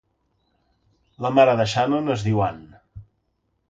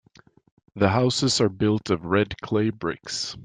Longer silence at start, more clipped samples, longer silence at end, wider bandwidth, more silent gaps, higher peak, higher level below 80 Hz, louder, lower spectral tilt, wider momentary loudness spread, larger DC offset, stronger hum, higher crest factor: first, 1.2 s vs 0.75 s; neither; first, 0.65 s vs 0 s; about the same, 9 kHz vs 9.8 kHz; neither; first, -2 dBFS vs -6 dBFS; about the same, -52 dBFS vs -54 dBFS; first, -20 LUFS vs -23 LUFS; first, -6.5 dB/octave vs -5 dB/octave; first, 11 LU vs 8 LU; neither; neither; about the same, 22 dB vs 20 dB